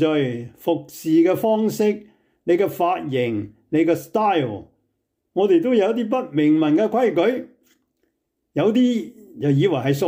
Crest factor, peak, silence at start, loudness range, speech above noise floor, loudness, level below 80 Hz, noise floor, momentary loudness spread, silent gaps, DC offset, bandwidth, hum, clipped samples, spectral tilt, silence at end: 14 dB; -8 dBFS; 0 s; 2 LU; 55 dB; -20 LUFS; -66 dBFS; -74 dBFS; 11 LU; none; under 0.1%; 16 kHz; none; under 0.1%; -7 dB/octave; 0 s